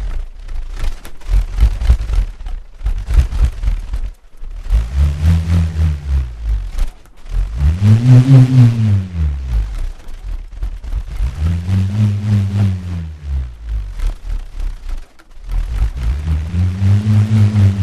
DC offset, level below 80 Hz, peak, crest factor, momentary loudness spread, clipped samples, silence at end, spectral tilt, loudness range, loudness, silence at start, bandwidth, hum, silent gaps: under 0.1%; -18 dBFS; 0 dBFS; 14 dB; 19 LU; under 0.1%; 0 s; -8 dB/octave; 9 LU; -16 LUFS; 0 s; 11.5 kHz; none; none